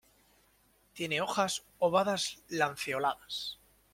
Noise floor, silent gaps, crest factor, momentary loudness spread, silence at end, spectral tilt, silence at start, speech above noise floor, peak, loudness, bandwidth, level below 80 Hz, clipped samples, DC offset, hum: -68 dBFS; none; 20 dB; 10 LU; 0.4 s; -3 dB/octave; 0.95 s; 36 dB; -14 dBFS; -32 LUFS; 16.5 kHz; -72 dBFS; under 0.1%; under 0.1%; none